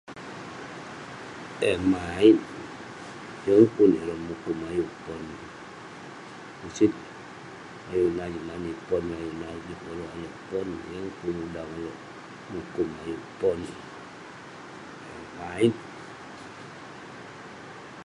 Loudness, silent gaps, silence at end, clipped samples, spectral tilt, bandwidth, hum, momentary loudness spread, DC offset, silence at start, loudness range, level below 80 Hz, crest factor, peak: -27 LUFS; none; 0 s; under 0.1%; -6.5 dB/octave; 11.5 kHz; none; 21 LU; under 0.1%; 0.05 s; 11 LU; -56 dBFS; 24 dB; -4 dBFS